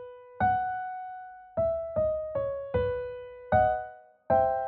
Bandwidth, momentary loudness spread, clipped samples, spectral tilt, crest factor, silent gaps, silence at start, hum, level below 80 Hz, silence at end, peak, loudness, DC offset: 4.3 kHz; 16 LU; under 0.1%; -6 dB/octave; 18 dB; none; 0 s; none; -50 dBFS; 0 s; -12 dBFS; -29 LUFS; under 0.1%